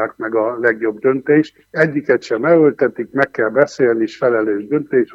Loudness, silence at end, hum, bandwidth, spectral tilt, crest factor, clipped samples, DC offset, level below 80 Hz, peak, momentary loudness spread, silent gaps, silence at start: -16 LUFS; 0 s; none; 7.8 kHz; -7 dB/octave; 16 dB; under 0.1%; under 0.1%; -64 dBFS; 0 dBFS; 6 LU; none; 0 s